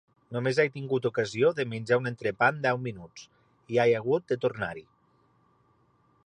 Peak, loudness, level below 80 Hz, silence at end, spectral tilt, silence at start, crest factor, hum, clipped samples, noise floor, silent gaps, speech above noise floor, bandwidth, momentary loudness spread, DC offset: -10 dBFS; -28 LUFS; -66 dBFS; 1.45 s; -6 dB/octave; 0.3 s; 20 dB; none; under 0.1%; -66 dBFS; none; 39 dB; 9.8 kHz; 13 LU; under 0.1%